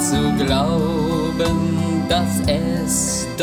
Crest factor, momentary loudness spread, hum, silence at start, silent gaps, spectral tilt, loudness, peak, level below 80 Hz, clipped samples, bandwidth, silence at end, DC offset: 14 dB; 2 LU; none; 0 s; none; -4.5 dB/octave; -19 LUFS; -4 dBFS; -34 dBFS; under 0.1%; 19.5 kHz; 0 s; under 0.1%